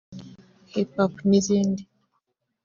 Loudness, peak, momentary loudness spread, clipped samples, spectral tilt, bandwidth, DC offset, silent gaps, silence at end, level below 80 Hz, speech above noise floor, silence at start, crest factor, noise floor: -24 LUFS; -8 dBFS; 18 LU; under 0.1%; -7.5 dB/octave; 7.4 kHz; under 0.1%; none; 0.8 s; -62 dBFS; 53 dB; 0.1 s; 18 dB; -75 dBFS